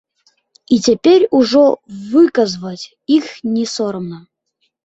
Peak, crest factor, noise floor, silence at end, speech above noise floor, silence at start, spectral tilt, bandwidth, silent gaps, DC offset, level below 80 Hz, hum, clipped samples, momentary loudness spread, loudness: -2 dBFS; 14 dB; -67 dBFS; 0.65 s; 54 dB; 0.7 s; -5 dB/octave; 8 kHz; none; under 0.1%; -56 dBFS; none; under 0.1%; 15 LU; -14 LUFS